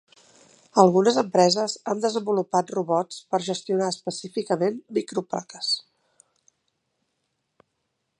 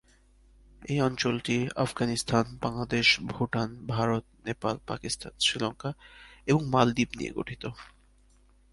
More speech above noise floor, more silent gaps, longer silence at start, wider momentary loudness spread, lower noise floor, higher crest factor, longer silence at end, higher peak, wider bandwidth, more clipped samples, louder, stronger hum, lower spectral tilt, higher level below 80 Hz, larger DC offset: first, 54 dB vs 32 dB; neither; about the same, 0.75 s vs 0.8 s; second, 11 LU vs 14 LU; first, -77 dBFS vs -61 dBFS; about the same, 24 dB vs 24 dB; first, 2.4 s vs 0.85 s; first, -2 dBFS vs -6 dBFS; about the same, 11 kHz vs 11.5 kHz; neither; first, -24 LUFS vs -29 LUFS; neither; about the same, -4.5 dB/octave vs -4.5 dB/octave; second, -76 dBFS vs -54 dBFS; neither